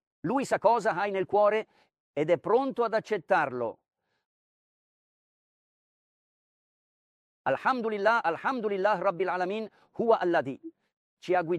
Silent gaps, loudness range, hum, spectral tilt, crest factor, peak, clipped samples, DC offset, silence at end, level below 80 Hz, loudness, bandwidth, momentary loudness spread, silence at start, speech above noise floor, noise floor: 2.00-2.14 s, 4.26-7.44 s, 10.97-11.17 s; 8 LU; none; -6 dB/octave; 20 dB; -10 dBFS; under 0.1%; under 0.1%; 0 s; -76 dBFS; -28 LUFS; 11.5 kHz; 11 LU; 0.25 s; over 63 dB; under -90 dBFS